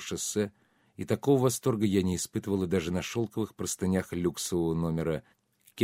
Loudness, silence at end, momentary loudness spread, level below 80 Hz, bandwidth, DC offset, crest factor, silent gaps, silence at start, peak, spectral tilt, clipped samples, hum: -30 LUFS; 0 s; 8 LU; -56 dBFS; 16 kHz; under 0.1%; 18 dB; none; 0 s; -12 dBFS; -5.5 dB/octave; under 0.1%; none